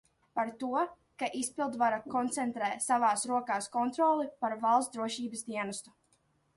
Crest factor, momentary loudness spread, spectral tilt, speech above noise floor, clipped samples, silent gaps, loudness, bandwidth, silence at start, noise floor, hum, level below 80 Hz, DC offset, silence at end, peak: 18 dB; 9 LU; -3 dB/octave; 40 dB; under 0.1%; none; -32 LUFS; 11.5 kHz; 0.35 s; -72 dBFS; none; -76 dBFS; under 0.1%; 0.75 s; -14 dBFS